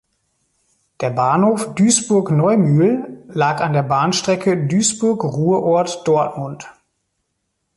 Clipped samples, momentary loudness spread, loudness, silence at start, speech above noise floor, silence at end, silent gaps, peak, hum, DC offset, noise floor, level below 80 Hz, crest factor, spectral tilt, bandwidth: under 0.1%; 9 LU; -17 LUFS; 1 s; 56 dB; 1.05 s; none; -2 dBFS; none; under 0.1%; -72 dBFS; -58 dBFS; 16 dB; -5 dB/octave; 11.5 kHz